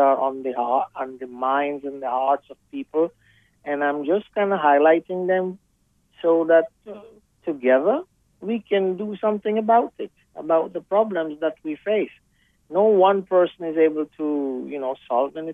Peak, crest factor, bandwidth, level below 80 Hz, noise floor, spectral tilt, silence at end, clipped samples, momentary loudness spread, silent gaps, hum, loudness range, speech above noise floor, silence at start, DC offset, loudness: -4 dBFS; 18 dB; 3.8 kHz; -68 dBFS; -65 dBFS; -8 dB/octave; 0 s; under 0.1%; 14 LU; none; none; 4 LU; 43 dB; 0 s; under 0.1%; -22 LUFS